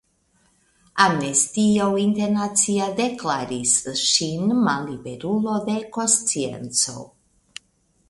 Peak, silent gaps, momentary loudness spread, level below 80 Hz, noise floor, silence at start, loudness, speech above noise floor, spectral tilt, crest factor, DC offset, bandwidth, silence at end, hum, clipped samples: 0 dBFS; none; 13 LU; -58 dBFS; -64 dBFS; 0.95 s; -21 LUFS; 43 dB; -3 dB/octave; 22 dB; under 0.1%; 11.5 kHz; 1.05 s; none; under 0.1%